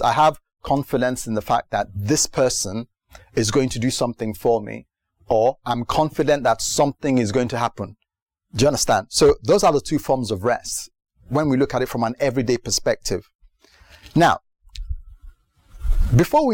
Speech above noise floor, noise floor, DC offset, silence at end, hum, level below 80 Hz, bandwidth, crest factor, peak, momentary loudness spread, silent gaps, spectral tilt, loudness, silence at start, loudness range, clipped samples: 33 dB; -53 dBFS; under 0.1%; 0 s; none; -34 dBFS; 17 kHz; 14 dB; -6 dBFS; 15 LU; 8.22-8.26 s, 13.35-13.39 s; -4.5 dB/octave; -20 LUFS; 0 s; 3 LU; under 0.1%